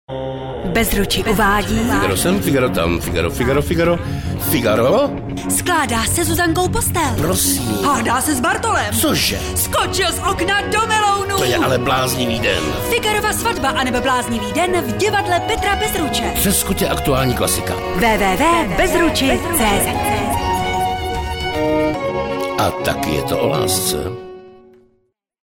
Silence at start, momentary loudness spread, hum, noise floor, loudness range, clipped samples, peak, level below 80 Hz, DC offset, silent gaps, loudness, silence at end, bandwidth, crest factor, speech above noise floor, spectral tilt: 0.1 s; 5 LU; none; -63 dBFS; 3 LU; under 0.1%; -4 dBFS; -32 dBFS; under 0.1%; none; -17 LUFS; 0.9 s; 19 kHz; 14 dB; 47 dB; -4 dB/octave